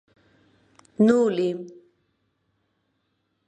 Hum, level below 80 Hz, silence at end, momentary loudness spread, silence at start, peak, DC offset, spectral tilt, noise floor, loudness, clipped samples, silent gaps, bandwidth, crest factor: none; -72 dBFS; 1.75 s; 25 LU; 1 s; -6 dBFS; under 0.1%; -7 dB/octave; -74 dBFS; -21 LUFS; under 0.1%; none; 8.8 kHz; 22 dB